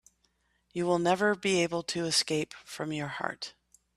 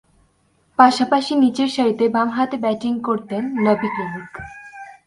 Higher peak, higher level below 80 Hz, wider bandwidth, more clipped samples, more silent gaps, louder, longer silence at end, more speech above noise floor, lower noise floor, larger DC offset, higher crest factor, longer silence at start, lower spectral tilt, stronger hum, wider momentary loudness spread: second, -12 dBFS vs 0 dBFS; second, -68 dBFS vs -58 dBFS; first, 13.5 kHz vs 11.5 kHz; neither; neither; second, -30 LUFS vs -19 LUFS; first, 0.45 s vs 0.15 s; about the same, 43 dB vs 43 dB; first, -73 dBFS vs -61 dBFS; neither; about the same, 20 dB vs 20 dB; about the same, 0.75 s vs 0.8 s; second, -3.5 dB/octave vs -5.5 dB/octave; neither; second, 12 LU vs 20 LU